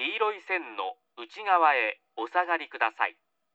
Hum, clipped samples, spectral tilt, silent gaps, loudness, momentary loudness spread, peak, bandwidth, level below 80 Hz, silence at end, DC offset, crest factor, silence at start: none; under 0.1%; -2 dB/octave; none; -28 LUFS; 14 LU; -8 dBFS; 7.8 kHz; under -90 dBFS; 0.45 s; under 0.1%; 20 dB; 0 s